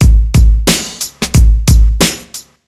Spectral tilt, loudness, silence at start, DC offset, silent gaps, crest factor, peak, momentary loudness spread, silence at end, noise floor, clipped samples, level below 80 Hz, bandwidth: -4.5 dB/octave; -11 LUFS; 0 s; under 0.1%; none; 10 dB; 0 dBFS; 10 LU; 0.25 s; -32 dBFS; 0.2%; -10 dBFS; 15.5 kHz